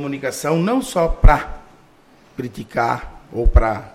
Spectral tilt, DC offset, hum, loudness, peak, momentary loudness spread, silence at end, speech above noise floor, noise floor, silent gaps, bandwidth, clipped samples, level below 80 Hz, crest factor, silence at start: -6 dB/octave; under 0.1%; none; -19 LUFS; 0 dBFS; 14 LU; 0.05 s; 34 dB; -50 dBFS; none; 14.5 kHz; under 0.1%; -20 dBFS; 18 dB; 0 s